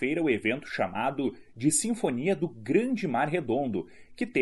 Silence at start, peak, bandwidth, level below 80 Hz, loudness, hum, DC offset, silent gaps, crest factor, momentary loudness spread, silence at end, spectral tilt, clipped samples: 0 s; -12 dBFS; 11.5 kHz; -64 dBFS; -29 LUFS; none; 0.2%; none; 18 dB; 7 LU; 0 s; -4.5 dB/octave; under 0.1%